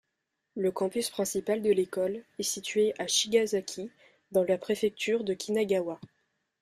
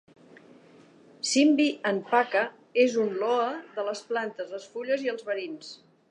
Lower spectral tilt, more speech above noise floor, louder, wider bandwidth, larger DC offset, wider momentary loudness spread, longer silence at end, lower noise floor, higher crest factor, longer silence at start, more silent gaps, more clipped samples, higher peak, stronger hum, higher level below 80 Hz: about the same, -3 dB/octave vs -3 dB/octave; first, 53 dB vs 28 dB; about the same, -29 LUFS vs -27 LUFS; first, 15.5 kHz vs 11 kHz; neither; second, 9 LU vs 14 LU; first, 0.55 s vs 0.35 s; first, -82 dBFS vs -55 dBFS; about the same, 18 dB vs 20 dB; second, 0.55 s vs 1.25 s; neither; neither; second, -12 dBFS vs -8 dBFS; neither; first, -70 dBFS vs -84 dBFS